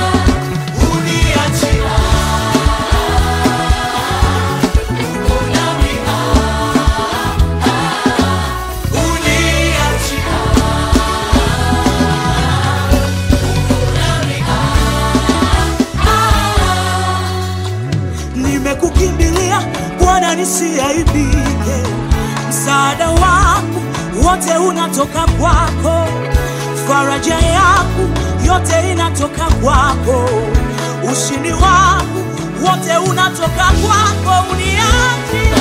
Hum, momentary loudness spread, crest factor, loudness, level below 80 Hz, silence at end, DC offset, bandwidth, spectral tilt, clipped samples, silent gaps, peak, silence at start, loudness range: none; 5 LU; 12 dB; -13 LUFS; -18 dBFS; 0 s; under 0.1%; 16 kHz; -4.5 dB/octave; under 0.1%; none; 0 dBFS; 0 s; 2 LU